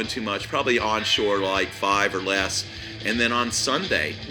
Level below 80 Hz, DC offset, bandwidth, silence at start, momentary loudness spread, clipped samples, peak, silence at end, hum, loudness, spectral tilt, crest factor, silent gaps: -48 dBFS; under 0.1%; over 20 kHz; 0 s; 6 LU; under 0.1%; -6 dBFS; 0 s; none; -23 LUFS; -2.5 dB/octave; 18 dB; none